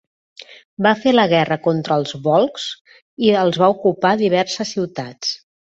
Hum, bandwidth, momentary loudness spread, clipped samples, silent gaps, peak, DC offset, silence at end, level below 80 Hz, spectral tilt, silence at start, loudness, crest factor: none; 8.2 kHz; 12 LU; under 0.1%; 0.65-0.77 s, 2.81-2.85 s, 3.02-3.17 s; -2 dBFS; under 0.1%; 0.4 s; -62 dBFS; -5 dB/octave; 0.4 s; -18 LUFS; 16 dB